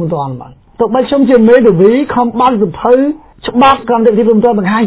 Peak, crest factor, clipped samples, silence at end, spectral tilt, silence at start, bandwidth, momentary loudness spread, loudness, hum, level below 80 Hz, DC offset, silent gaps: 0 dBFS; 10 dB; 1%; 0 s; -11 dB/octave; 0 s; 4 kHz; 11 LU; -9 LUFS; none; -42 dBFS; under 0.1%; none